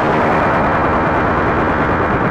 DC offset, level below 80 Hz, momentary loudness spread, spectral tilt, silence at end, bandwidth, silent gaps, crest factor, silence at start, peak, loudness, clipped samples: under 0.1%; -30 dBFS; 1 LU; -8 dB/octave; 0 s; 10.5 kHz; none; 10 dB; 0 s; -4 dBFS; -14 LUFS; under 0.1%